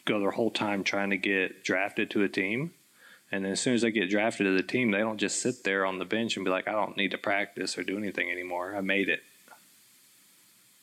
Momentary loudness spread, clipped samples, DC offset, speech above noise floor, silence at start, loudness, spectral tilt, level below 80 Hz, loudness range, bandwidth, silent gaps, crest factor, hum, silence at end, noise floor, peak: 6 LU; under 0.1%; under 0.1%; 32 dB; 0.05 s; -29 LUFS; -4 dB/octave; -80 dBFS; 3 LU; 15.5 kHz; none; 16 dB; none; 1.3 s; -61 dBFS; -14 dBFS